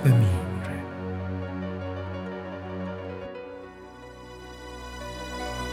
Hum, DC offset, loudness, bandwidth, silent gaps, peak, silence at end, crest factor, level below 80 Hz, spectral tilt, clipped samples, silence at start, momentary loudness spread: none; under 0.1%; -31 LUFS; 15 kHz; none; -8 dBFS; 0 s; 22 dB; -46 dBFS; -7 dB/octave; under 0.1%; 0 s; 15 LU